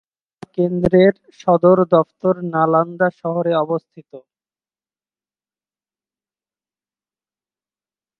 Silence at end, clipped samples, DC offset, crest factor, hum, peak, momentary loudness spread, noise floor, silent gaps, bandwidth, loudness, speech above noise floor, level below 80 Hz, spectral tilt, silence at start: 4 s; under 0.1%; under 0.1%; 20 dB; none; 0 dBFS; 9 LU; under -90 dBFS; none; 6.4 kHz; -17 LUFS; over 74 dB; -54 dBFS; -9 dB/octave; 0.55 s